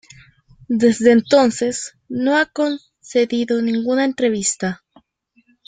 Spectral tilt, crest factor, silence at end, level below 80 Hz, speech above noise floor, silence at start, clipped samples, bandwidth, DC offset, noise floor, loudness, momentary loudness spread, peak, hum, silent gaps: -4 dB/octave; 16 dB; 0.9 s; -60 dBFS; 44 dB; 0.7 s; under 0.1%; 9.6 kHz; under 0.1%; -61 dBFS; -18 LUFS; 12 LU; -2 dBFS; none; none